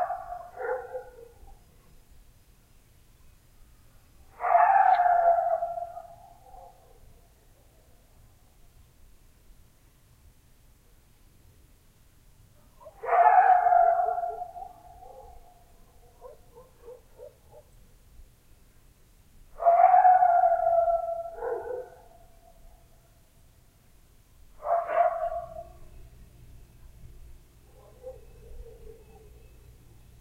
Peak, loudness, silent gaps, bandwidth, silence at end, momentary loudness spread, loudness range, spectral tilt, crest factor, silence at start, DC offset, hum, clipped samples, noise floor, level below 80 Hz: -8 dBFS; -24 LUFS; none; 6.4 kHz; 1.3 s; 28 LU; 18 LU; -5 dB/octave; 22 dB; 0 s; under 0.1%; none; under 0.1%; -59 dBFS; -54 dBFS